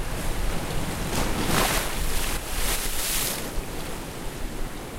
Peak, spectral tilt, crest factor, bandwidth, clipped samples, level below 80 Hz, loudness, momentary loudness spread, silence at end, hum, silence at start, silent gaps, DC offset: -6 dBFS; -3 dB/octave; 20 dB; 16 kHz; under 0.1%; -30 dBFS; -28 LUFS; 11 LU; 0 s; none; 0 s; none; under 0.1%